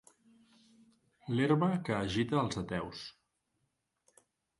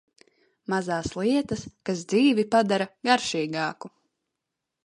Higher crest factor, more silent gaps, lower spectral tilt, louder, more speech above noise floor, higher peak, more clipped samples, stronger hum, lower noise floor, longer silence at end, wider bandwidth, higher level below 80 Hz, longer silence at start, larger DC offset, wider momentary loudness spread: about the same, 20 dB vs 20 dB; neither; first, -6.5 dB/octave vs -4.5 dB/octave; second, -33 LUFS vs -25 LUFS; second, 49 dB vs 59 dB; second, -16 dBFS vs -6 dBFS; neither; neither; about the same, -82 dBFS vs -84 dBFS; first, 1.5 s vs 1 s; about the same, 11.5 kHz vs 11 kHz; about the same, -62 dBFS vs -58 dBFS; first, 1.25 s vs 0.7 s; neither; first, 17 LU vs 11 LU